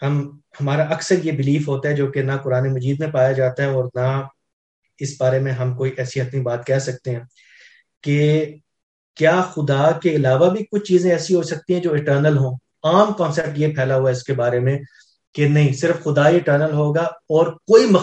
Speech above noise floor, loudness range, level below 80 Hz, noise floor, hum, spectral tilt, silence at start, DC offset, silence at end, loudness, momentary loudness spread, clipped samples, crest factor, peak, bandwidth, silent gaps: 32 dB; 5 LU; -60 dBFS; -50 dBFS; none; -7 dB/octave; 0 s; under 0.1%; 0 s; -19 LUFS; 9 LU; under 0.1%; 18 dB; 0 dBFS; 8.6 kHz; 4.53-4.82 s, 7.97-8.01 s, 8.83-9.14 s, 15.27-15.33 s